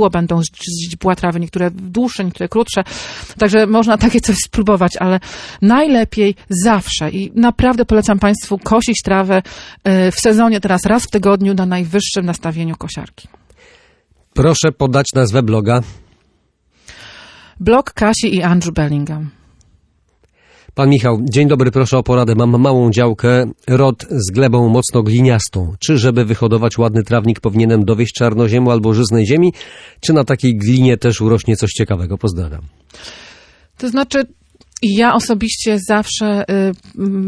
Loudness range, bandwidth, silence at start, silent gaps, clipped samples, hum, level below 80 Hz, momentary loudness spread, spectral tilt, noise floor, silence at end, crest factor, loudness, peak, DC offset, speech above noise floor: 5 LU; 11 kHz; 0 s; none; under 0.1%; none; -36 dBFS; 9 LU; -6 dB/octave; -59 dBFS; 0 s; 12 dB; -14 LUFS; -2 dBFS; under 0.1%; 46 dB